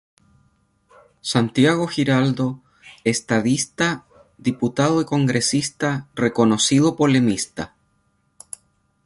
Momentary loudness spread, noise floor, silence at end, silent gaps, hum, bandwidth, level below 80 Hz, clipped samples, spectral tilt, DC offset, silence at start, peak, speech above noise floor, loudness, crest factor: 15 LU; -66 dBFS; 1.4 s; none; none; 11.5 kHz; -56 dBFS; under 0.1%; -4.5 dB/octave; under 0.1%; 1.25 s; -4 dBFS; 46 dB; -20 LUFS; 18 dB